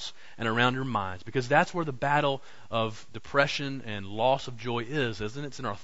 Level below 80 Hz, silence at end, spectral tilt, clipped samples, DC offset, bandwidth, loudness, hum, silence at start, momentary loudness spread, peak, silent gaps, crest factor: -58 dBFS; 0 s; -5 dB/octave; under 0.1%; 1%; 8 kHz; -29 LUFS; none; 0 s; 11 LU; -6 dBFS; none; 22 dB